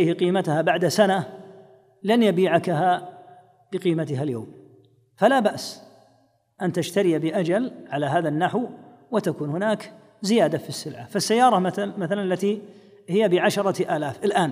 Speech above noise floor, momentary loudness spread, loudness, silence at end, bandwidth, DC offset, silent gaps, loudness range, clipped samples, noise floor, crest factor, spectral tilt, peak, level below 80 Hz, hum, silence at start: 40 dB; 13 LU; -23 LUFS; 0 s; 15.5 kHz; under 0.1%; none; 3 LU; under 0.1%; -62 dBFS; 18 dB; -5.5 dB/octave; -4 dBFS; -74 dBFS; none; 0 s